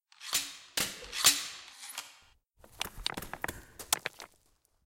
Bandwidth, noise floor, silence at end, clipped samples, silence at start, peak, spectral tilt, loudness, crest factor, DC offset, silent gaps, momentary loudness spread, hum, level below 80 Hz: 17 kHz; -71 dBFS; 0.6 s; under 0.1%; 0.2 s; -10 dBFS; 0.5 dB/octave; -32 LUFS; 28 dB; under 0.1%; none; 21 LU; none; -58 dBFS